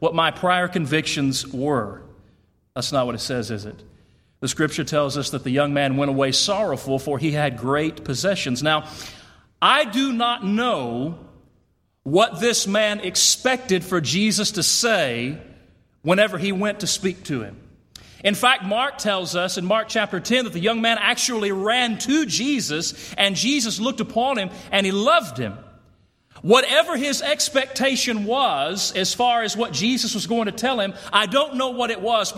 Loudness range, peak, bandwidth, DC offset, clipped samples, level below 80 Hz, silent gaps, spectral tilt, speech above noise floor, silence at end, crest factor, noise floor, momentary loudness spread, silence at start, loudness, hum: 4 LU; -2 dBFS; 16.5 kHz; under 0.1%; under 0.1%; -56 dBFS; none; -3 dB/octave; 43 dB; 0 s; 20 dB; -64 dBFS; 9 LU; 0 s; -21 LUFS; none